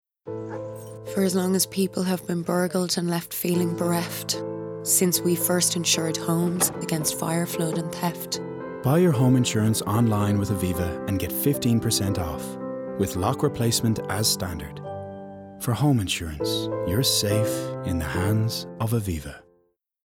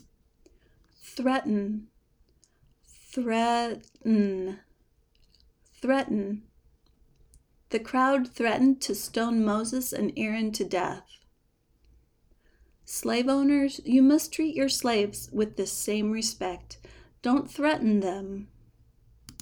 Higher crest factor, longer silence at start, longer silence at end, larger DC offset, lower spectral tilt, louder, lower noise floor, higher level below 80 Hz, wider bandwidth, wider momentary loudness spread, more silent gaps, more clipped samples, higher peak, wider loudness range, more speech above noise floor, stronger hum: about the same, 16 dB vs 18 dB; second, 0.25 s vs 1.05 s; first, 0.65 s vs 0.1 s; neither; about the same, -4.5 dB/octave vs -4.5 dB/octave; first, -24 LUFS vs -27 LUFS; about the same, -67 dBFS vs -69 dBFS; first, -52 dBFS vs -60 dBFS; about the same, 19.5 kHz vs over 20 kHz; about the same, 12 LU vs 13 LU; neither; neither; first, -8 dBFS vs -12 dBFS; second, 3 LU vs 8 LU; about the same, 43 dB vs 42 dB; neither